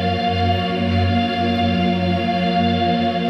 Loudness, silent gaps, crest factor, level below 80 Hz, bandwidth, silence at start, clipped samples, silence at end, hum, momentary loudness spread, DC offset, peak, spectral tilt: -19 LUFS; none; 12 dB; -44 dBFS; 6.6 kHz; 0 s; under 0.1%; 0 s; none; 1 LU; under 0.1%; -6 dBFS; -7.5 dB/octave